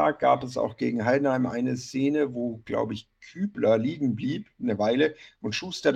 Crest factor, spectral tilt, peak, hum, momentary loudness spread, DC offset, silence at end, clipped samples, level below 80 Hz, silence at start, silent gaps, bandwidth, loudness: 18 dB; -6 dB/octave; -8 dBFS; none; 9 LU; under 0.1%; 0 s; under 0.1%; -64 dBFS; 0 s; none; 9.4 kHz; -27 LUFS